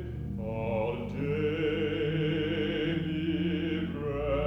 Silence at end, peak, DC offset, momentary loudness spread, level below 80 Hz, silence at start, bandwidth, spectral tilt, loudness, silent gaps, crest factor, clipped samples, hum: 0 s; -18 dBFS; under 0.1%; 5 LU; -46 dBFS; 0 s; 6.4 kHz; -8.5 dB/octave; -31 LUFS; none; 14 dB; under 0.1%; none